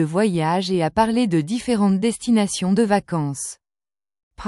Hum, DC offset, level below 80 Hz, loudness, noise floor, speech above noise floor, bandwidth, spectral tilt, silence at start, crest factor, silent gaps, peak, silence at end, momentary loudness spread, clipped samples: none; under 0.1%; -50 dBFS; -20 LUFS; under -90 dBFS; over 71 dB; 12 kHz; -5.5 dB/octave; 0 s; 16 dB; 4.23-4.31 s; -4 dBFS; 0 s; 7 LU; under 0.1%